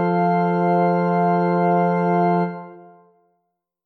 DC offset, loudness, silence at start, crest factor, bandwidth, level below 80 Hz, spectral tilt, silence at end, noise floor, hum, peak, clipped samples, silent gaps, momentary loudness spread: under 0.1%; -19 LUFS; 0 s; 12 dB; 4.4 kHz; -74 dBFS; -10.5 dB/octave; 1.05 s; -75 dBFS; none; -8 dBFS; under 0.1%; none; 3 LU